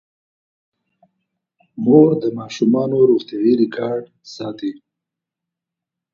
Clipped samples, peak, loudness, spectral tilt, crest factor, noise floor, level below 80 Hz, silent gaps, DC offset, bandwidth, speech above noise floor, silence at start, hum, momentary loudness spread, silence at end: under 0.1%; 0 dBFS; -17 LUFS; -7.5 dB/octave; 18 dB; -84 dBFS; -66 dBFS; none; under 0.1%; 7.4 kHz; 68 dB; 1.75 s; none; 16 LU; 1.4 s